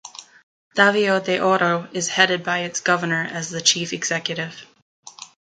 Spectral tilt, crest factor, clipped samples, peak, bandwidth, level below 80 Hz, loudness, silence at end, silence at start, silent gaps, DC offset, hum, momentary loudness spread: -2.5 dB/octave; 22 dB; under 0.1%; 0 dBFS; 10.5 kHz; -70 dBFS; -20 LUFS; 0.35 s; 0.05 s; 0.43-0.71 s, 4.82-5.03 s; under 0.1%; none; 18 LU